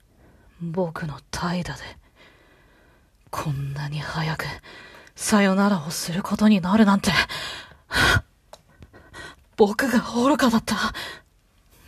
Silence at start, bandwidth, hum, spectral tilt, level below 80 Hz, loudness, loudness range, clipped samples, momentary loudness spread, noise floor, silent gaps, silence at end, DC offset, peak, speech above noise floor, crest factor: 0.6 s; 14 kHz; none; -5 dB/octave; -46 dBFS; -22 LUFS; 11 LU; under 0.1%; 21 LU; -59 dBFS; none; 0.7 s; under 0.1%; -4 dBFS; 37 dB; 20 dB